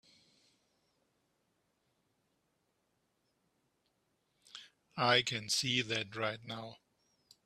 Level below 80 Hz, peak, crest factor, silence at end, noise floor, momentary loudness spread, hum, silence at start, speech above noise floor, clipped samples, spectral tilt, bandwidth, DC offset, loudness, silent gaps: -78 dBFS; -14 dBFS; 26 dB; 0.7 s; -80 dBFS; 23 LU; none; 4.55 s; 45 dB; under 0.1%; -2.5 dB/octave; 14 kHz; under 0.1%; -33 LUFS; none